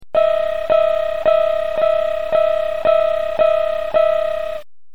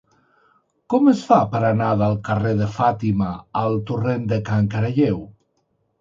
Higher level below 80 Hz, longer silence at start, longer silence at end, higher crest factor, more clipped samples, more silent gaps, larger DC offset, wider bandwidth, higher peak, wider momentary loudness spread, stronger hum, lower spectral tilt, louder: about the same, -46 dBFS vs -48 dBFS; second, 0 s vs 0.9 s; second, 0 s vs 0.7 s; second, 14 dB vs 20 dB; neither; neither; first, 3% vs under 0.1%; second, 6 kHz vs 7.6 kHz; about the same, -2 dBFS vs -2 dBFS; about the same, 4 LU vs 6 LU; neither; second, -4.5 dB/octave vs -8.5 dB/octave; first, -17 LUFS vs -20 LUFS